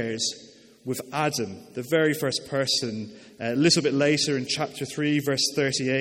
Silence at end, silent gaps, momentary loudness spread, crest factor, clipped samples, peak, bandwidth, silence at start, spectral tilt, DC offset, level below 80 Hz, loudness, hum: 0 s; none; 13 LU; 18 dB; under 0.1%; -8 dBFS; 16.5 kHz; 0 s; -3.5 dB/octave; under 0.1%; -66 dBFS; -25 LUFS; none